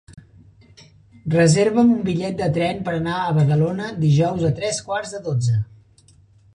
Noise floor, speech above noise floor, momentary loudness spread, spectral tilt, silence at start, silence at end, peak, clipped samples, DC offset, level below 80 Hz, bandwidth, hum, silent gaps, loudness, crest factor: -53 dBFS; 34 dB; 9 LU; -6.5 dB/octave; 0.1 s; 0.9 s; -4 dBFS; under 0.1%; under 0.1%; -50 dBFS; 10.5 kHz; none; none; -20 LUFS; 16 dB